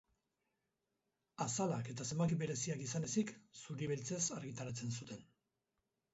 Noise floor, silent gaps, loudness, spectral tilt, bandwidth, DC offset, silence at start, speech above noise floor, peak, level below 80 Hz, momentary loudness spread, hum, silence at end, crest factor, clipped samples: -88 dBFS; none; -41 LUFS; -6.5 dB/octave; 8 kHz; under 0.1%; 1.4 s; 47 dB; -24 dBFS; -74 dBFS; 12 LU; none; 0.9 s; 18 dB; under 0.1%